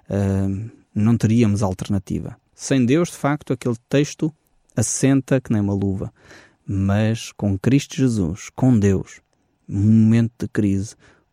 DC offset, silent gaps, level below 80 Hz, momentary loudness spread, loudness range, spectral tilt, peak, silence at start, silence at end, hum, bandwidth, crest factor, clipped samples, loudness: under 0.1%; none; -48 dBFS; 12 LU; 3 LU; -6.5 dB/octave; -6 dBFS; 0.1 s; 0.4 s; none; 14.5 kHz; 14 dB; under 0.1%; -20 LUFS